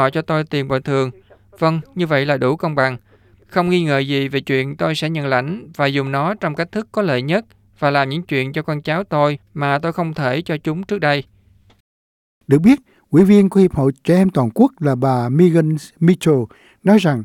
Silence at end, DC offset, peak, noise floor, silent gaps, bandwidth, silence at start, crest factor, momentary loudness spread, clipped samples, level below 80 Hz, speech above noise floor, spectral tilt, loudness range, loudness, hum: 0 s; under 0.1%; -2 dBFS; under -90 dBFS; 11.80-12.41 s; 15 kHz; 0 s; 16 dB; 8 LU; under 0.1%; -52 dBFS; over 74 dB; -7.5 dB/octave; 5 LU; -17 LUFS; none